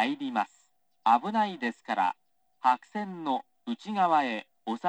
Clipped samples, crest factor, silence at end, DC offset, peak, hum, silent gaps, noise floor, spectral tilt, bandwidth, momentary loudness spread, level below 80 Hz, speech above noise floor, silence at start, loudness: under 0.1%; 18 dB; 0 s; under 0.1%; -10 dBFS; none; none; -69 dBFS; -5.5 dB/octave; 9.2 kHz; 12 LU; -88 dBFS; 41 dB; 0 s; -29 LUFS